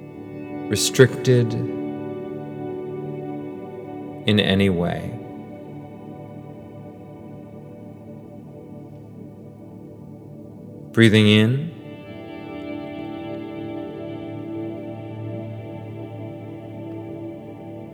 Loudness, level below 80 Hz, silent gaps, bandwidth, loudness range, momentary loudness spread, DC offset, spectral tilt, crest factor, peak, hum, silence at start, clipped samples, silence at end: -23 LUFS; -58 dBFS; none; 18.5 kHz; 19 LU; 23 LU; under 0.1%; -5.5 dB/octave; 24 dB; 0 dBFS; none; 0 s; under 0.1%; 0 s